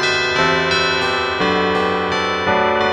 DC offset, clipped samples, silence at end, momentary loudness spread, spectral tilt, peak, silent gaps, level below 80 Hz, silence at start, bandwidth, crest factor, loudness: under 0.1%; under 0.1%; 0 s; 3 LU; -4 dB/octave; -4 dBFS; none; -44 dBFS; 0 s; 10.5 kHz; 12 dB; -16 LUFS